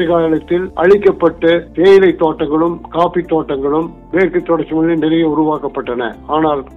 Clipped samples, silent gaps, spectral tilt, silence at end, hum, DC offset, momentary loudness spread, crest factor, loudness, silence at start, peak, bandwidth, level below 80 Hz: under 0.1%; none; -8 dB/octave; 0 s; none; under 0.1%; 9 LU; 12 dB; -13 LUFS; 0 s; 0 dBFS; 6.2 kHz; -40 dBFS